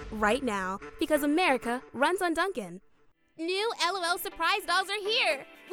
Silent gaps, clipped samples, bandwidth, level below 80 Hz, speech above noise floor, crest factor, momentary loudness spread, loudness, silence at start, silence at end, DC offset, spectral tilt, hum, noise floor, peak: none; under 0.1%; 19 kHz; -56 dBFS; 34 dB; 18 dB; 9 LU; -28 LUFS; 0 s; 0 s; under 0.1%; -3 dB/octave; none; -63 dBFS; -10 dBFS